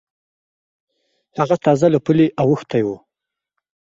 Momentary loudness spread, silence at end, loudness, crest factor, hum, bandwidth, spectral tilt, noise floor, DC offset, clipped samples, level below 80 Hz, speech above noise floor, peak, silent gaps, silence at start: 11 LU; 1 s; -17 LUFS; 18 dB; none; 8 kHz; -8 dB/octave; -84 dBFS; under 0.1%; under 0.1%; -58 dBFS; 68 dB; -2 dBFS; none; 1.35 s